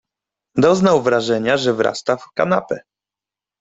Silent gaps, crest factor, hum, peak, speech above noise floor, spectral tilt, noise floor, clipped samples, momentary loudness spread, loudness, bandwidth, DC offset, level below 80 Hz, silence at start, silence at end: none; 18 dB; none; -2 dBFS; 72 dB; -5.5 dB/octave; -89 dBFS; under 0.1%; 10 LU; -17 LUFS; 8 kHz; under 0.1%; -58 dBFS; 0.55 s; 0.8 s